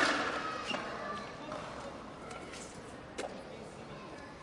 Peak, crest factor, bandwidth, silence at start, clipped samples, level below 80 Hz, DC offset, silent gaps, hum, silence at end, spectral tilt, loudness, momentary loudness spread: -16 dBFS; 24 dB; 11.5 kHz; 0 s; under 0.1%; -64 dBFS; under 0.1%; none; none; 0 s; -3 dB/octave; -41 LUFS; 12 LU